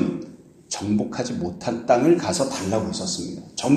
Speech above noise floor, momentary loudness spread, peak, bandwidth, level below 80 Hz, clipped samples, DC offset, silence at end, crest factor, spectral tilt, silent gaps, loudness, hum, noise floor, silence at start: 20 dB; 13 LU; -2 dBFS; 13 kHz; -56 dBFS; under 0.1%; under 0.1%; 0 s; 20 dB; -5 dB/octave; none; -24 LUFS; none; -42 dBFS; 0 s